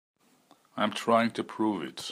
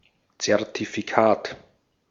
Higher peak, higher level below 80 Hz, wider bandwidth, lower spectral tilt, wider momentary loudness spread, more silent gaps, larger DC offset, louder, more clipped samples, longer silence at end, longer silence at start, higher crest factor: second, -12 dBFS vs -2 dBFS; second, -78 dBFS vs -66 dBFS; first, 15.5 kHz vs 7.8 kHz; about the same, -4.5 dB/octave vs -4 dB/octave; second, 8 LU vs 13 LU; neither; neither; second, -29 LUFS vs -23 LUFS; neither; second, 0 s vs 0.5 s; first, 0.75 s vs 0.4 s; about the same, 20 dB vs 24 dB